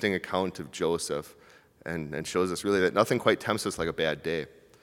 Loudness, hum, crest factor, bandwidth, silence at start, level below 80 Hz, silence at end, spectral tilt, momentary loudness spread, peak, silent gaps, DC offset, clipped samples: -29 LUFS; none; 22 dB; 18 kHz; 0 s; -60 dBFS; 0.35 s; -4.5 dB/octave; 12 LU; -6 dBFS; none; under 0.1%; under 0.1%